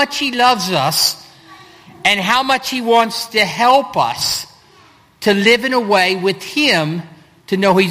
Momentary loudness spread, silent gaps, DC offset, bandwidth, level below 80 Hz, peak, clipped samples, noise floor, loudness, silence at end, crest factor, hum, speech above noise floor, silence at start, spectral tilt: 7 LU; none; under 0.1%; 15.5 kHz; -56 dBFS; 0 dBFS; under 0.1%; -48 dBFS; -14 LUFS; 0 s; 16 dB; none; 33 dB; 0 s; -3 dB/octave